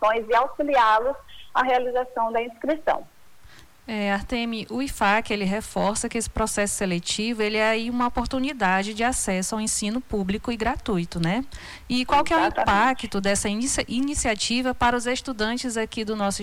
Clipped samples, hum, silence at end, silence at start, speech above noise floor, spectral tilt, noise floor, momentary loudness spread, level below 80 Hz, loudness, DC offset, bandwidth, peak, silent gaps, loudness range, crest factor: under 0.1%; none; 0 s; 0 s; 27 dB; -3.5 dB/octave; -51 dBFS; 7 LU; -42 dBFS; -24 LUFS; under 0.1%; 19 kHz; -10 dBFS; none; 4 LU; 14 dB